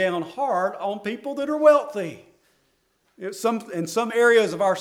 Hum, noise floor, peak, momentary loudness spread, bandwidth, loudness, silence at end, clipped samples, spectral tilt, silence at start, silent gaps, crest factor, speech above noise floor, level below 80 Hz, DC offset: none; -68 dBFS; -4 dBFS; 14 LU; 16.5 kHz; -22 LUFS; 0 s; under 0.1%; -4.5 dB/octave; 0 s; none; 20 dB; 46 dB; -72 dBFS; under 0.1%